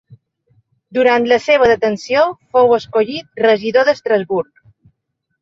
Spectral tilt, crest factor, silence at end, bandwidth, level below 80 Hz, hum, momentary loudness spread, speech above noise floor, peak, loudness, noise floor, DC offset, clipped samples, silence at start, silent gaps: -5 dB/octave; 14 dB; 1 s; 7.6 kHz; -54 dBFS; none; 9 LU; 58 dB; -2 dBFS; -14 LUFS; -72 dBFS; under 0.1%; under 0.1%; 0.95 s; none